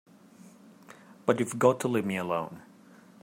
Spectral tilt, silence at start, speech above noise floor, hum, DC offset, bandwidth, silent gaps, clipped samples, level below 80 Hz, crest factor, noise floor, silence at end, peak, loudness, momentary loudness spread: -5.5 dB/octave; 0.4 s; 27 dB; none; under 0.1%; 16 kHz; none; under 0.1%; -76 dBFS; 24 dB; -55 dBFS; 0.65 s; -8 dBFS; -28 LUFS; 12 LU